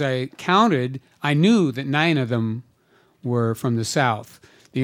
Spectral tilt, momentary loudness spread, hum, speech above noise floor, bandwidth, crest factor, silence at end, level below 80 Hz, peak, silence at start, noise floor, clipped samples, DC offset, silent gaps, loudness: -6 dB/octave; 12 LU; none; 39 dB; 16 kHz; 18 dB; 0 s; -68 dBFS; -2 dBFS; 0 s; -59 dBFS; under 0.1%; under 0.1%; none; -21 LUFS